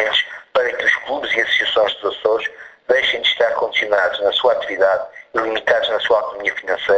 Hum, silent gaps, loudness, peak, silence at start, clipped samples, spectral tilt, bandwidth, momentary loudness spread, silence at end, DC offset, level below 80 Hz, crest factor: none; none; -17 LUFS; -2 dBFS; 0 s; under 0.1%; -2 dB/octave; 8.4 kHz; 6 LU; 0 s; under 0.1%; -58 dBFS; 16 dB